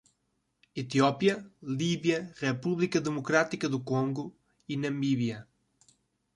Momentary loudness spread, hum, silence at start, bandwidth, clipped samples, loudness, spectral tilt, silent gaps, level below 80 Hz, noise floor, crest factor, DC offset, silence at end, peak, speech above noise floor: 11 LU; none; 0.75 s; 11.5 kHz; under 0.1%; -30 LUFS; -5.5 dB/octave; none; -70 dBFS; -77 dBFS; 22 dB; under 0.1%; 0.95 s; -10 dBFS; 48 dB